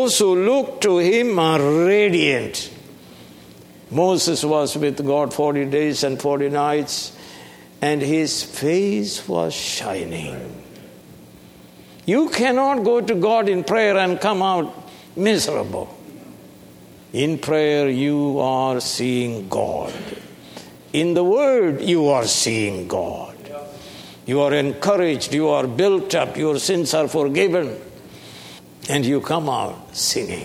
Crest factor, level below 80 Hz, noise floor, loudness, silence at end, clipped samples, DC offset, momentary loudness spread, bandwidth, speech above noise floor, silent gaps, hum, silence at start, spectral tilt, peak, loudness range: 18 dB; -58 dBFS; -44 dBFS; -19 LUFS; 0 s; under 0.1%; under 0.1%; 18 LU; 16.5 kHz; 25 dB; none; none; 0 s; -4 dB/octave; -2 dBFS; 4 LU